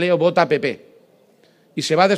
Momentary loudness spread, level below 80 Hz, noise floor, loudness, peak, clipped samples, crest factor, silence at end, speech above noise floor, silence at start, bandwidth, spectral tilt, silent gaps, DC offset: 15 LU; -70 dBFS; -55 dBFS; -19 LUFS; 0 dBFS; under 0.1%; 18 dB; 0 s; 38 dB; 0 s; 13 kHz; -5 dB/octave; none; under 0.1%